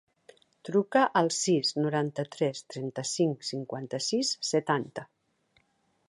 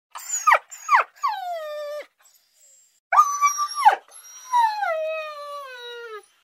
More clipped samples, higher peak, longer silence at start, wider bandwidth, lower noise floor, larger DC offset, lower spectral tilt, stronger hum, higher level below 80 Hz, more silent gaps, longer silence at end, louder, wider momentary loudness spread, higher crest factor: neither; second, -10 dBFS vs -2 dBFS; first, 0.65 s vs 0.15 s; second, 11.5 kHz vs 16 kHz; first, -72 dBFS vs -59 dBFS; neither; first, -4 dB/octave vs 4 dB/octave; neither; first, -78 dBFS vs under -90 dBFS; second, none vs 2.99-3.11 s; first, 1.05 s vs 0.25 s; second, -29 LUFS vs -22 LUFS; second, 12 LU vs 17 LU; about the same, 20 dB vs 22 dB